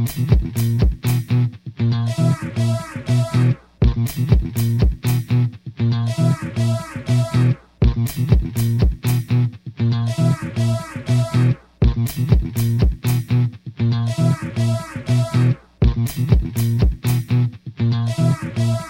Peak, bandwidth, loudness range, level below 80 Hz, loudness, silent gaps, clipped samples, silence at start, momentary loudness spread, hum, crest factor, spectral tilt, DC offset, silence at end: -2 dBFS; 16.5 kHz; 1 LU; -26 dBFS; -20 LUFS; none; under 0.1%; 0 s; 4 LU; none; 16 dB; -7 dB/octave; under 0.1%; 0 s